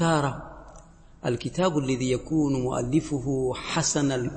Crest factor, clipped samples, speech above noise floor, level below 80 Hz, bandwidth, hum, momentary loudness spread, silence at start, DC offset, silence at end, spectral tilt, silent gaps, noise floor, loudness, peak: 16 dB; under 0.1%; 23 dB; -48 dBFS; 8.8 kHz; none; 7 LU; 0 s; under 0.1%; 0 s; -5 dB/octave; none; -49 dBFS; -26 LUFS; -10 dBFS